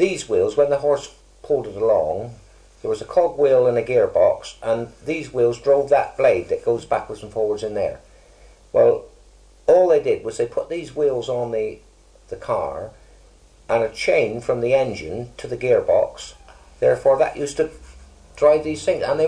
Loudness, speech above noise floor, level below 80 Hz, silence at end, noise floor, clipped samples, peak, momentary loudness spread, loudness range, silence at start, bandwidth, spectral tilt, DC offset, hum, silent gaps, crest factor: -20 LUFS; 30 dB; -50 dBFS; 0 s; -50 dBFS; under 0.1%; -4 dBFS; 12 LU; 5 LU; 0 s; 10.5 kHz; -5.5 dB/octave; under 0.1%; none; none; 16 dB